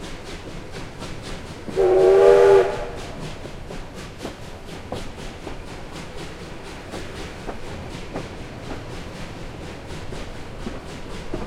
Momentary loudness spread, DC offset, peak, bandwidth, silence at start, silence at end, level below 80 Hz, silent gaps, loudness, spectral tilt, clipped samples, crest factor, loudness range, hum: 21 LU; under 0.1%; -2 dBFS; 12 kHz; 0 s; 0 s; -38 dBFS; none; -20 LUFS; -6 dB/octave; under 0.1%; 22 dB; 16 LU; none